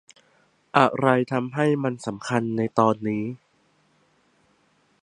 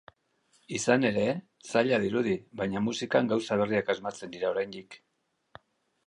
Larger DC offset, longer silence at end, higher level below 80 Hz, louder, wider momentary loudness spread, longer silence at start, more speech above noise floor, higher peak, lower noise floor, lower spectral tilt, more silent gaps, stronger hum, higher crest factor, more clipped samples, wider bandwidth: neither; first, 1.65 s vs 1.1 s; about the same, -66 dBFS vs -66 dBFS; first, -23 LUFS vs -29 LUFS; about the same, 10 LU vs 11 LU; about the same, 0.75 s vs 0.7 s; about the same, 42 dB vs 41 dB; first, -2 dBFS vs -8 dBFS; second, -64 dBFS vs -69 dBFS; first, -6.5 dB/octave vs -5 dB/octave; neither; neither; about the same, 24 dB vs 22 dB; neither; about the same, 10.5 kHz vs 11 kHz